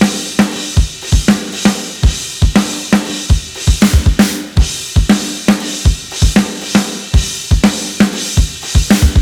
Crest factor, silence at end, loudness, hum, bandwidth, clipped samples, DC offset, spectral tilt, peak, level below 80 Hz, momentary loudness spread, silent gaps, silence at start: 12 dB; 0 s; -13 LUFS; none; 19 kHz; under 0.1%; under 0.1%; -4.5 dB/octave; 0 dBFS; -18 dBFS; 5 LU; none; 0 s